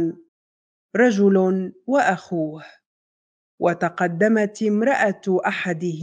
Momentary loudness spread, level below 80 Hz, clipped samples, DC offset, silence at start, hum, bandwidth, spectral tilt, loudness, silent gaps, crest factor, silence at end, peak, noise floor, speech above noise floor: 10 LU; -72 dBFS; under 0.1%; under 0.1%; 0 s; none; 9.2 kHz; -6.5 dB/octave; -21 LUFS; 0.28-0.89 s, 2.86-3.58 s; 16 dB; 0 s; -4 dBFS; under -90 dBFS; over 70 dB